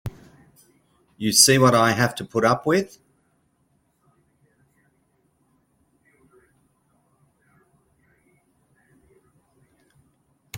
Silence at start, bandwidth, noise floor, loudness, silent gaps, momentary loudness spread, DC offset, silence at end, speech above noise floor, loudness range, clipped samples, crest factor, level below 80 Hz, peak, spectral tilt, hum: 0.05 s; 16.5 kHz; -67 dBFS; -18 LUFS; none; 15 LU; under 0.1%; 0 s; 48 dB; 11 LU; under 0.1%; 26 dB; -58 dBFS; 0 dBFS; -3.5 dB/octave; none